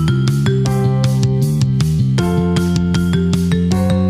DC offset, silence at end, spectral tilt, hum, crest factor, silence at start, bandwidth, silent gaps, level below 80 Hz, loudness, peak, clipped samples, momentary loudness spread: under 0.1%; 0 s; -7 dB/octave; none; 10 dB; 0 s; 15 kHz; none; -32 dBFS; -15 LUFS; -4 dBFS; under 0.1%; 1 LU